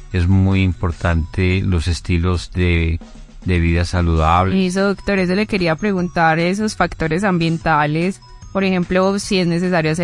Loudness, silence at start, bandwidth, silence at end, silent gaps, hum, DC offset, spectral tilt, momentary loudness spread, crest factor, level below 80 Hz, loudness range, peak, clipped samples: -17 LUFS; 0 s; 11.5 kHz; 0 s; none; none; under 0.1%; -6.5 dB/octave; 5 LU; 16 dB; -32 dBFS; 2 LU; 0 dBFS; under 0.1%